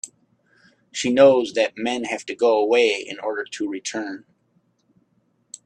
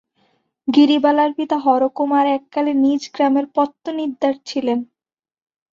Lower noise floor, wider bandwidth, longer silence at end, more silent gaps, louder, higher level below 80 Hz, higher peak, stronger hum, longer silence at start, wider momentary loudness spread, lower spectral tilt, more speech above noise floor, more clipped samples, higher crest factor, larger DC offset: second, -66 dBFS vs under -90 dBFS; first, 10 kHz vs 7.4 kHz; first, 1.45 s vs 0.9 s; neither; second, -21 LUFS vs -18 LUFS; about the same, -70 dBFS vs -66 dBFS; about the same, -2 dBFS vs -2 dBFS; neither; second, 0.05 s vs 0.65 s; first, 18 LU vs 10 LU; about the same, -3.5 dB/octave vs -4.5 dB/octave; second, 46 dB vs over 73 dB; neither; about the same, 20 dB vs 16 dB; neither